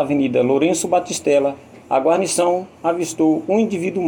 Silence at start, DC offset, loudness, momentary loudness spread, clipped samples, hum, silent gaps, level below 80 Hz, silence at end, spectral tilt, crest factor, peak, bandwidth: 0 s; under 0.1%; -18 LUFS; 5 LU; under 0.1%; none; none; -62 dBFS; 0 s; -4.5 dB/octave; 14 dB; -4 dBFS; 19 kHz